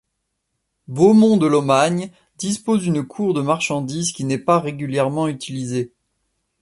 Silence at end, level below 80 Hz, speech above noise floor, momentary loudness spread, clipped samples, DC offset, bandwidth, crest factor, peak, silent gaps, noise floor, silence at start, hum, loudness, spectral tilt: 0.75 s; -60 dBFS; 57 dB; 13 LU; under 0.1%; under 0.1%; 11.5 kHz; 18 dB; -2 dBFS; none; -75 dBFS; 0.9 s; none; -19 LUFS; -5.5 dB/octave